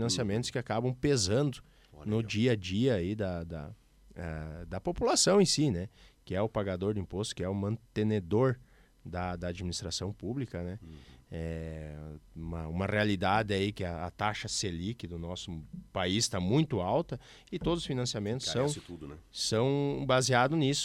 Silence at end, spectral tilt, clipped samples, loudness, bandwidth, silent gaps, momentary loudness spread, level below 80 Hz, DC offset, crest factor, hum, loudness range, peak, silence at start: 0 s; -4.5 dB/octave; under 0.1%; -32 LUFS; 15.5 kHz; none; 15 LU; -52 dBFS; under 0.1%; 20 dB; none; 6 LU; -12 dBFS; 0 s